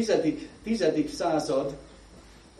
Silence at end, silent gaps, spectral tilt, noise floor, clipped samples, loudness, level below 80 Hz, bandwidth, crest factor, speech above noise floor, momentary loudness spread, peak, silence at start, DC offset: 0.3 s; none; -5 dB/octave; -51 dBFS; under 0.1%; -28 LUFS; -54 dBFS; 13 kHz; 18 dB; 24 dB; 11 LU; -10 dBFS; 0 s; under 0.1%